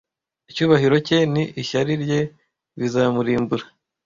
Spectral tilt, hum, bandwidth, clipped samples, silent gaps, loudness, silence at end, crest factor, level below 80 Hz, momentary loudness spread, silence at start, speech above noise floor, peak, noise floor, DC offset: -6.5 dB/octave; none; 7.6 kHz; under 0.1%; none; -20 LUFS; 0.4 s; 18 dB; -56 dBFS; 11 LU; 0.5 s; 33 dB; -2 dBFS; -52 dBFS; under 0.1%